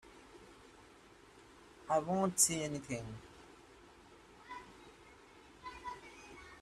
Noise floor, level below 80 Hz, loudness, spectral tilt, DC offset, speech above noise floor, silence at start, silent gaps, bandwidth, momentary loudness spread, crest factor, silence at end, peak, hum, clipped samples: -61 dBFS; -68 dBFS; -35 LUFS; -3.5 dB/octave; under 0.1%; 26 dB; 0.05 s; none; 14 kHz; 29 LU; 26 dB; 0 s; -16 dBFS; none; under 0.1%